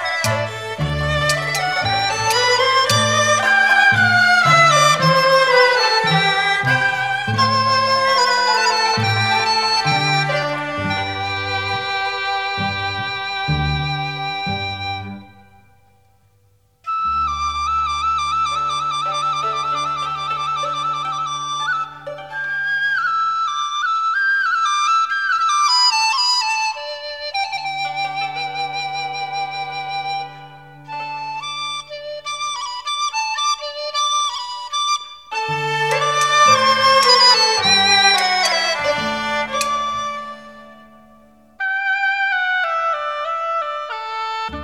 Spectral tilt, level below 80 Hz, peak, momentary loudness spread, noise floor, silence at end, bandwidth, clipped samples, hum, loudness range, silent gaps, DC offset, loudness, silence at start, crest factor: -2.5 dB/octave; -44 dBFS; 0 dBFS; 13 LU; -58 dBFS; 0 s; 16 kHz; under 0.1%; none; 12 LU; none; 0.2%; -17 LUFS; 0 s; 18 dB